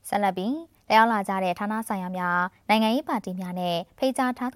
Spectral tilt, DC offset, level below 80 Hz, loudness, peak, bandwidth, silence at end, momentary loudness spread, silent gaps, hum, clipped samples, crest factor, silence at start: -5 dB/octave; under 0.1%; -66 dBFS; -25 LUFS; -6 dBFS; 16.5 kHz; 0.05 s; 10 LU; none; none; under 0.1%; 20 dB; 0.05 s